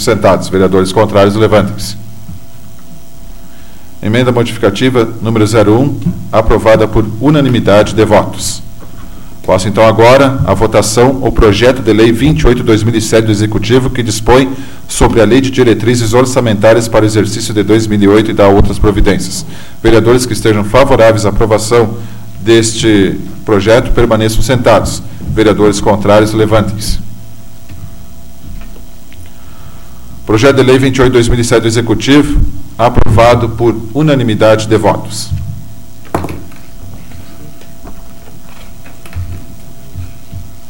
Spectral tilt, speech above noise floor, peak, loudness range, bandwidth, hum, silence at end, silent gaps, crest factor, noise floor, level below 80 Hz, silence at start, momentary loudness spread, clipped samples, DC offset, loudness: -5.5 dB/octave; 26 dB; 0 dBFS; 9 LU; 17 kHz; none; 0.2 s; none; 10 dB; -34 dBFS; -22 dBFS; 0 s; 15 LU; 0.2%; 8%; -9 LUFS